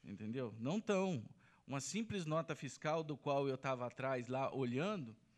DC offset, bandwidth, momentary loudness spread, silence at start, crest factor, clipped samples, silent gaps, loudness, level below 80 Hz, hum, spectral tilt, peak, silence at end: under 0.1%; 13 kHz; 8 LU; 0.05 s; 16 dB; under 0.1%; none; -41 LUFS; -80 dBFS; none; -5.5 dB/octave; -24 dBFS; 0.25 s